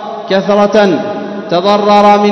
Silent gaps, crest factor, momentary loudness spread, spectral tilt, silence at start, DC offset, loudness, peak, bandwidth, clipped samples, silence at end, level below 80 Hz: none; 10 dB; 9 LU; -6 dB/octave; 0 s; under 0.1%; -10 LUFS; 0 dBFS; 8 kHz; 1%; 0 s; -52 dBFS